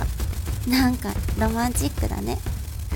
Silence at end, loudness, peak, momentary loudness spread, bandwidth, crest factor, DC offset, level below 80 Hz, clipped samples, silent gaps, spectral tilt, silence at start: 0 s; -25 LUFS; -8 dBFS; 8 LU; 17.5 kHz; 16 dB; under 0.1%; -28 dBFS; under 0.1%; none; -5 dB/octave; 0 s